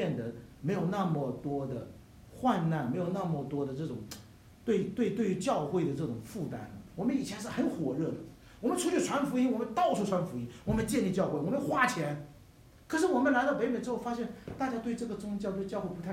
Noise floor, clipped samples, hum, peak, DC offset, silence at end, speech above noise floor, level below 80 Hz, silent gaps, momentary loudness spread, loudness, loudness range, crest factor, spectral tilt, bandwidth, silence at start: -57 dBFS; under 0.1%; none; -14 dBFS; under 0.1%; 0 s; 25 dB; -58 dBFS; none; 11 LU; -33 LUFS; 3 LU; 20 dB; -6 dB/octave; 16 kHz; 0 s